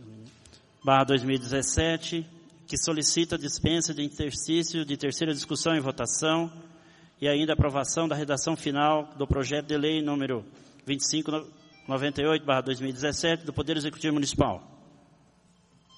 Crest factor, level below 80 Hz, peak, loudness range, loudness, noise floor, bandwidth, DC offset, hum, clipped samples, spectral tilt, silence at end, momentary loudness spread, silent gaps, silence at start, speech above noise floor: 22 dB; -48 dBFS; -6 dBFS; 2 LU; -27 LUFS; -62 dBFS; 11.5 kHz; under 0.1%; none; under 0.1%; -4 dB/octave; 1.2 s; 8 LU; none; 0 s; 34 dB